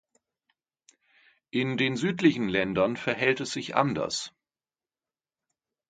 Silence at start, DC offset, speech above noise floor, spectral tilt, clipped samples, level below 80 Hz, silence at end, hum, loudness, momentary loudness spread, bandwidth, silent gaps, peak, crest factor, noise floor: 1.55 s; under 0.1%; over 63 dB; -5 dB/octave; under 0.1%; -64 dBFS; 1.6 s; none; -27 LUFS; 7 LU; 9.4 kHz; none; -6 dBFS; 24 dB; under -90 dBFS